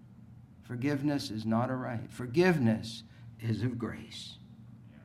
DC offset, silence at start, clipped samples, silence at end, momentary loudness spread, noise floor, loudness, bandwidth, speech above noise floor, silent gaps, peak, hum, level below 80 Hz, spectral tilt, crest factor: under 0.1%; 0.05 s; under 0.1%; 0 s; 23 LU; -53 dBFS; -32 LUFS; 14.5 kHz; 22 dB; none; -14 dBFS; none; -64 dBFS; -6.5 dB/octave; 20 dB